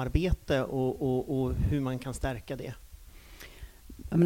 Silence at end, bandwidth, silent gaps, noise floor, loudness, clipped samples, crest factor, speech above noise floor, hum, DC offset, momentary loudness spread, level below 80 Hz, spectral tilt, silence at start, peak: 0 s; 17 kHz; none; -50 dBFS; -31 LUFS; under 0.1%; 18 dB; 20 dB; none; under 0.1%; 20 LU; -40 dBFS; -7.5 dB/octave; 0 s; -12 dBFS